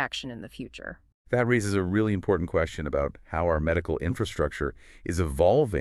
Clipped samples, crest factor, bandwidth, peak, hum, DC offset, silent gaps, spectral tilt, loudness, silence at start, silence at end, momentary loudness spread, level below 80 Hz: under 0.1%; 18 dB; 13 kHz; -10 dBFS; none; under 0.1%; 1.14-1.25 s; -6.5 dB/octave; -27 LUFS; 0 s; 0 s; 16 LU; -40 dBFS